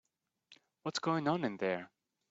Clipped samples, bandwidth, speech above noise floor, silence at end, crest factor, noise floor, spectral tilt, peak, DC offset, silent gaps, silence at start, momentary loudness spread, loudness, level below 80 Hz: under 0.1%; 8 kHz; 34 dB; 0.45 s; 20 dB; -69 dBFS; -4.5 dB/octave; -18 dBFS; under 0.1%; none; 0.5 s; 11 LU; -36 LUFS; -80 dBFS